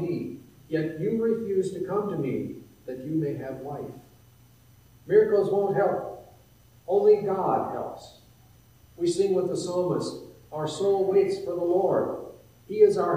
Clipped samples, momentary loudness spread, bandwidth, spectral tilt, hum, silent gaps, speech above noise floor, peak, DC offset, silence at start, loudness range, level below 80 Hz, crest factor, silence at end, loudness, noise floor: under 0.1%; 18 LU; 15.5 kHz; -6.5 dB/octave; none; none; 31 dB; -8 dBFS; under 0.1%; 0 s; 5 LU; -64 dBFS; 18 dB; 0 s; -26 LUFS; -56 dBFS